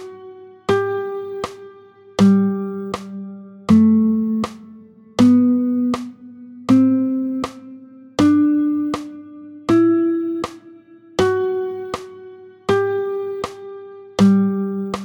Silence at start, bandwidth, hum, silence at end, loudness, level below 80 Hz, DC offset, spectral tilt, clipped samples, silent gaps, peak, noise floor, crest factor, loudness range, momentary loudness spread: 0 s; 11.5 kHz; none; 0 s; -18 LUFS; -54 dBFS; under 0.1%; -7 dB/octave; under 0.1%; none; -2 dBFS; -44 dBFS; 16 dB; 5 LU; 21 LU